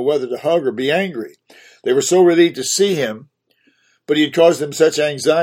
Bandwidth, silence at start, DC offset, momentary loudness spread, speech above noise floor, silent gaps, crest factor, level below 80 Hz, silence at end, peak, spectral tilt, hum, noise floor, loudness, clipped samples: 16.5 kHz; 0 s; under 0.1%; 12 LU; 44 dB; none; 16 dB; -66 dBFS; 0 s; 0 dBFS; -4 dB/octave; none; -60 dBFS; -16 LUFS; under 0.1%